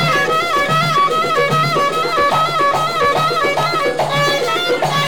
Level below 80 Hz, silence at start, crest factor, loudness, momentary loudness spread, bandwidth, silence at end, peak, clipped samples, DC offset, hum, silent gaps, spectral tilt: -48 dBFS; 0 s; 10 dB; -15 LUFS; 2 LU; 19 kHz; 0 s; -4 dBFS; under 0.1%; 1%; none; none; -4 dB/octave